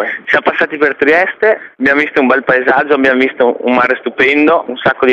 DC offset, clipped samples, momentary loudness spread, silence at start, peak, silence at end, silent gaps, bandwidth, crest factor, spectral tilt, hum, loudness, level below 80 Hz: under 0.1%; under 0.1%; 4 LU; 0 s; 0 dBFS; 0 s; none; 7.6 kHz; 12 dB; -6 dB/octave; none; -11 LUFS; -52 dBFS